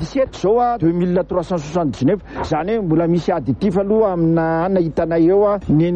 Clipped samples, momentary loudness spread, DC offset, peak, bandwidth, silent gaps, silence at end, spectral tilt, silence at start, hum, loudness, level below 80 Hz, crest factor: under 0.1%; 6 LU; under 0.1%; -6 dBFS; 8.4 kHz; none; 0 s; -8.5 dB/octave; 0 s; none; -17 LUFS; -40 dBFS; 12 dB